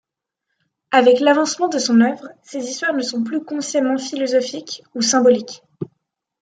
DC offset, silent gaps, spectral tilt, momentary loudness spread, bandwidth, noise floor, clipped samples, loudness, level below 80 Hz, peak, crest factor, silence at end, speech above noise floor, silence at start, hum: under 0.1%; none; -3 dB/octave; 18 LU; 9.4 kHz; -79 dBFS; under 0.1%; -17 LUFS; -70 dBFS; -2 dBFS; 18 dB; 0.55 s; 62 dB; 0.9 s; none